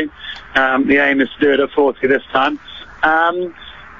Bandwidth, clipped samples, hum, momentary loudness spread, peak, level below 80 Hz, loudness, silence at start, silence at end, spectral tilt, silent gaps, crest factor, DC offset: 7 kHz; under 0.1%; none; 15 LU; 0 dBFS; -48 dBFS; -15 LUFS; 0 s; 0.05 s; -6 dB/octave; none; 16 dB; 0.4%